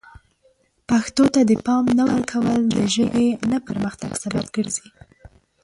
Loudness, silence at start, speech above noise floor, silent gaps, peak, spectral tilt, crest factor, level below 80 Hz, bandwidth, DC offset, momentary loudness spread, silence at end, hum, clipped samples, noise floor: -20 LUFS; 0.9 s; 42 dB; none; -6 dBFS; -5 dB/octave; 16 dB; -52 dBFS; 11.5 kHz; under 0.1%; 9 LU; 0.35 s; none; under 0.1%; -61 dBFS